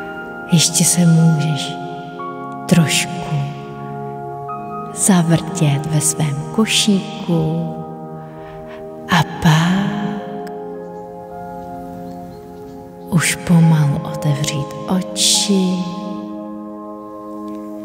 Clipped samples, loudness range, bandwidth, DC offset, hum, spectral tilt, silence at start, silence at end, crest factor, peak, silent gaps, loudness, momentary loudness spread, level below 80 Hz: under 0.1%; 5 LU; 16 kHz; under 0.1%; none; -4.5 dB/octave; 0 s; 0 s; 18 dB; 0 dBFS; none; -16 LUFS; 19 LU; -48 dBFS